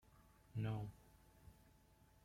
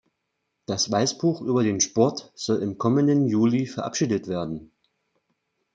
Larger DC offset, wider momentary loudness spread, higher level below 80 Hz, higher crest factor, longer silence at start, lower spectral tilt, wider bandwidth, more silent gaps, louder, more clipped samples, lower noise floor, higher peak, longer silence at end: neither; first, 22 LU vs 11 LU; second, -70 dBFS vs -64 dBFS; about the same, 20 dB vs 20 dB; second, 0.15 s vs 0.7 s; first, -8 dB/octave vs -5 dB/octave; first, 16 kHz vs 9.2 kHz; neither; second, -48 LUFS vs -24 LUFS; neither; second, -71 dBFS vs -78 dBFS; second, -32 dBFS vs -6 dBFS; second, 0.55 s vs 1.1 s